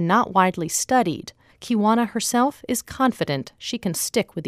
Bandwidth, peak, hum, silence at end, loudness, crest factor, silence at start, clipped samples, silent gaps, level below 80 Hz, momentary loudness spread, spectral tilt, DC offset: 15.5 kHz; -4 dBFS; none; 0 s; -22 LUFS; 18 dB; 0 s; under 0.1%; none; -56 dBFS; 9 LU; -4 dB/octave; under 0.1%